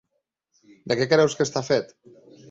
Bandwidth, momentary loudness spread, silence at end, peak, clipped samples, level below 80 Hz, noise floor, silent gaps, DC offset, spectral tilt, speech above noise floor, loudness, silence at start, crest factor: 8 kHz; 8 LU; 0.65 s; -6 dBFS; under 0.1%; -64 dBFS; -78 dBFS; none; under 0.1%; -4.5 dB/octave; 55 dB; -22 LUFS; 0.85 s; 20 dB